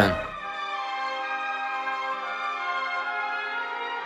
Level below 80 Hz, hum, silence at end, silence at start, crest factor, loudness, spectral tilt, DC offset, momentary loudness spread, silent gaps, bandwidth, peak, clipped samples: -54 dBFS; none; 0 s; 0 s; 22 dB; -29 LUFS; -4.5 dB/octave; under 0.1%; 3 LU; none; 16 kHz; -6 dBFS; under 0.1%